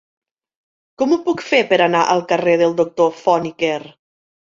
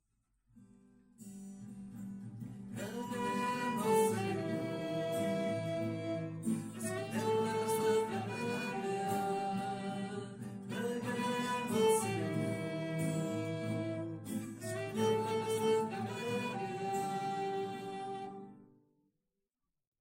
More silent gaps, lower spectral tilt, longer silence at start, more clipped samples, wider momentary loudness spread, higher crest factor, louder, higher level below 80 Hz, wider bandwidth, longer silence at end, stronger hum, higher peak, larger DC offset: neither; about the same, -5 dB/octave vs -5.5 dB/octave; first, 1 s vs 0.55 s; neither; second, 7 LU vs 14 LU; about the same, 16 dB vs 18 dB; first, -16 LUFS vs -37 LUFS; first, -62 dBFS vs -74 dBFS; second, 7.6 kHz vs 16 kHz; second, 0.7 s vs 1.35 s; neither; first, -2 dBFS vs -20 dBFS; neither